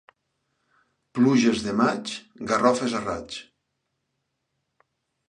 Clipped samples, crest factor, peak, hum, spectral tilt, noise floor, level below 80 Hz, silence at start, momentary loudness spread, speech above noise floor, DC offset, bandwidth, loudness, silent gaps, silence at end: under 0.1%; 22 dB; -4 dBFS; none; -5 dB/octave; -78 dBFS; -60 dBFS; 1.15 s; 15 LU; 55 dB; under 0.1%; 10 kHz; -24 LUFS; none; 1.85 s